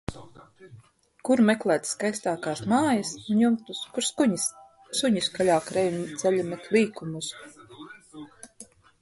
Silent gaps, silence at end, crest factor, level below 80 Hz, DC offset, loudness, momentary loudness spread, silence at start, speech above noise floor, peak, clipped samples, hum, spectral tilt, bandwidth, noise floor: none; 0.4 s; 18 dB; -60 dBFS; under 0.1%; -26 LUFS; 22 LU; 0.1 s; 26 dB; -8 dBFS; under 0.1%; none; -4 dB/octave; 12 kHz; -51 dBFS